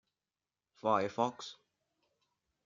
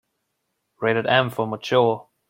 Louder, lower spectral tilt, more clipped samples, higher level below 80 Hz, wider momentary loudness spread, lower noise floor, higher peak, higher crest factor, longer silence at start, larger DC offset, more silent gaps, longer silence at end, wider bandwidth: second, -34 LUFS vs -21 LUFS; about the same, -5 dB/octave vs -6 dB/octave; neither; second, -80 dBFS vs -66 dBFS; first, 16 LU vs 7 LU; first, under -90 dBFS vs -76 dBFS; second, -16 dBFS vs -4 dBFS; about the same, 24 dB vs 20 dB; about the same, 0.85 s vs 0.8 s; neither; neither; first, 1.1 s vs 0.3 s; second, 7.6 kHz vs 16.5 kHz